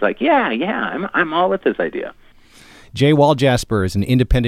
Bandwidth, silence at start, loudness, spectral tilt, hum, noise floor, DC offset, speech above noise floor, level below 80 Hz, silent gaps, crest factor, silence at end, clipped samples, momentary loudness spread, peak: 15 kHz; 0 s; -17 LUFS; -6.5 dB/octave; none; -45 dBFS; under 0.1%; 29 dB; -30 dBFS; none; 16 dB; 0 s; under 0.1%; 10 LU; -2 dBFS